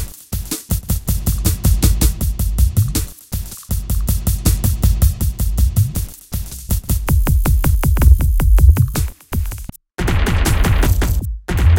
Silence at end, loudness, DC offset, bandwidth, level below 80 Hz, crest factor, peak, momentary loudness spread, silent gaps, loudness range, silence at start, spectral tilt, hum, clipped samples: 0 s; -18 LUFS; under 0.1%; 17.5 kHz; -16 dBFS; 14 dB; 0 dBFS; 13 LU; none; 3 LU; 0 s; -5 dB/octave; none; under 0.1%